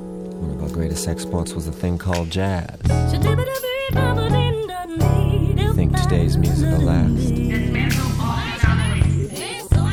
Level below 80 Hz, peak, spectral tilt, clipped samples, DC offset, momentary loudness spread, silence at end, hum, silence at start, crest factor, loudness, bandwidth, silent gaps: -28 dBFS; -2 dBFS; -6.5 dB/octave; under 0.1%; under 0.1%; 7 LU; 0 s; none; 0 s; 18 dB; -20 LUFS; 17.5 kHz; none